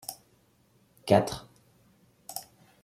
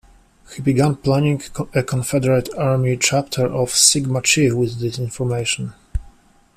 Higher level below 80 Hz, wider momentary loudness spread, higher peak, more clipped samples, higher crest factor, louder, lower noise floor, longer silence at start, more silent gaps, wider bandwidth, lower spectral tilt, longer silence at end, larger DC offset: second, -64 dBFS vs -40 dBFS; first, 23 LU vs 12 LU; second, -6 dBFS vs 0 dBFS; neither; first, 26 dB vs 20 dB; second, -29 LUFS vs -18 LUFS; first, -65 dBFS vs -48 dBFS; second, 0.1 s vs 0.5 s; neither; about the same, 16 kHz vs 15 kHz; first, -5.5 dB/octave vs -4 dB/octave; about the same, 0.4 s vs 0.5 s; neither